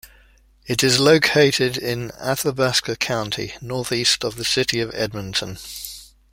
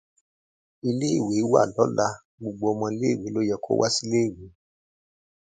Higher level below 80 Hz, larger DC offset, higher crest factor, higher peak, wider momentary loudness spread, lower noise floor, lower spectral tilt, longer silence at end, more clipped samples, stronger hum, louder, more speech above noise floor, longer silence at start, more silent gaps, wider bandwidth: first, -50 dBFS vs -60 dBFS; neither; about the same, 20 dB vs 20 dB; about the same, -2 dBFS vs -4 dBFS; first, 15 LU vs 8 LU; second, -53 dBFS vs under -90 dBFS; second, -3.5 dB/octave vs -5 dB/octave; second, 0.25 s vs 0.95 s; neither; neither; first, -20 LUFS vs -24 LUFS; second, 33 dB vs over 66 dB; second, 0.05 s vs 0.85 s; second, none vs 2.25-2.38 s; first, 16.5 kHz vs 9.4 kHz